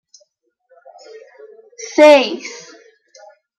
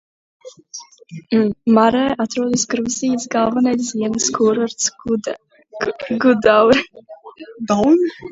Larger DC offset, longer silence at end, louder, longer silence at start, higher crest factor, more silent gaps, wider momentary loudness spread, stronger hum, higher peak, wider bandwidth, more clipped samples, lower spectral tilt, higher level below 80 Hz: neither; first, 1.05 s vs 0 s; first, -11 LUFS vs -17 LUFS; first, 1.8 s vs 0.45 s; about the same, 16 dB vs 18 dB; neither; first, 25 LU vs 21 LU; neither; about the same, -2 dBFS vs 0 dBFS; first, 10 kHz vs 8 kHz; neither; second, -2 dB/octave vs -4 dB/octave; second, -70 dBFS vs -52 dBFS